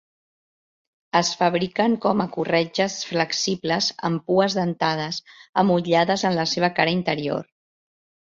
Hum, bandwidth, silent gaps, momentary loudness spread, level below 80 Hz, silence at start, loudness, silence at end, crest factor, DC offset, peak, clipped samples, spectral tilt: none; 7.6 kHz; 5.49-5.53 s; 7 LU; -64 dBFS; 1.15 s; -22 LUFS; 0.95 s; 18 dB; under 0.1%; -4 dBFS; under 0.1%; -4.5 dB/octave